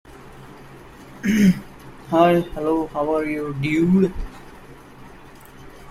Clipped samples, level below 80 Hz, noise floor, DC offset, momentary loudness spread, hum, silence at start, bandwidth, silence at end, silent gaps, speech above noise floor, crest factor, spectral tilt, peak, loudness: under 0.1%; -42 dBFS; -43 dBFS; under 0.1%; 25 LU; none; 0.1 s; 14.5 kHz; 0 s; none; 24 dB; 18 dB; -7 dB/octave; -4 dBFS; -20 LUFS